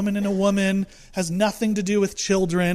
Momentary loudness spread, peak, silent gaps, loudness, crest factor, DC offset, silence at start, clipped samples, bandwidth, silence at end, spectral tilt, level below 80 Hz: 6 LU; -8 dBFS; none; -22 LUFS; 14 dB; under 0.1%; 0 s; under 0.1%; 15 kHz; 0 s; -5 dB/octave; -48 dBFS